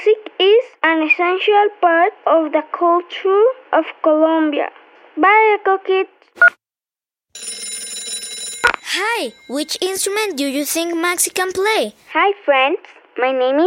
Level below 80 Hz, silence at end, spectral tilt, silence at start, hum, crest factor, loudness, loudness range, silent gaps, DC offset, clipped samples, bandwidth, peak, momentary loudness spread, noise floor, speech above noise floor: -62 dBFS; 0 s; -1 dB/octave; 0 s; none; 16 dB; -16 LUFS; 5 LU; none; under 0.1%; under 0.1%; 16.5 kHz; -2 dBFS; 12 LU; under -90 dBFS; over 74 dB